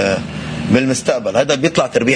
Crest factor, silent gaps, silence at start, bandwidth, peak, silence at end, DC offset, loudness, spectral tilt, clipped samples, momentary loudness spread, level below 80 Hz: 14 dB; none; 0 s; 10.5 kHz; 0 dBFS; 0 s; under 0.1%; -16 LUFS; -4.5 dB/octave; under 0.1%; 7 LU; -44 dBFS